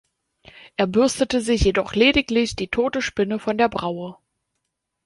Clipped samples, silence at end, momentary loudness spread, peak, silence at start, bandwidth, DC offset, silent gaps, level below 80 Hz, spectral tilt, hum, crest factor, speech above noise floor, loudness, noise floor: under 0.1%; 0.9 s; 11 LU; -4 dBFS; 0.65 s; 11.5 kHz; under 0.1%; none; -38 dBFS; -4.5 dB/octave; none; 18 dB; 57 dB; -21 LUFS; -78 dBFS